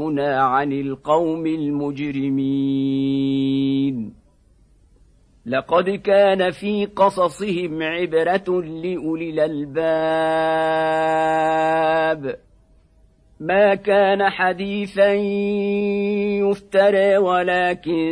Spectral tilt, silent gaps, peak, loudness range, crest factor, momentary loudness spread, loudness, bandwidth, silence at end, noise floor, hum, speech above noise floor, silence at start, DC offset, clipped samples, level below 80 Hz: -6.5 dB/octave; none; -4 dBFS; 3 LU; 16 dB; 8 LU; -19 LUFS; 10.5 kHz; 0 s; -55 dBFS; none; 36 dB; 0 s; under 0.1%; under 0.1%; -54 dBFS